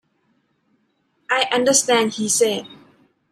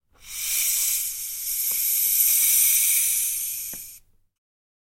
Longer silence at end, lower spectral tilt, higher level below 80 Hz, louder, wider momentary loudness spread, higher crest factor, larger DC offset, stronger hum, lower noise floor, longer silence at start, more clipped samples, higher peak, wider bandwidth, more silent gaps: second, 0.55 s vs 1 s; first, -1.5 dB/octave vs 4 dB/octave; second, -70 dBFS vs -58 dBFS; about the same, -18 LUFS vs -20 LUFS; second, 6 LU vs 14 LU; about the same, 18 dB vs 18 dB; neither; neither; first, -67 dBFS vs -50 dBFS; first, 1.3 s vs 0.25 s; neither; first, -2 dBFS vs -6 dBFS; about the same, 15.5 kHz vs 16.5 kHz; neither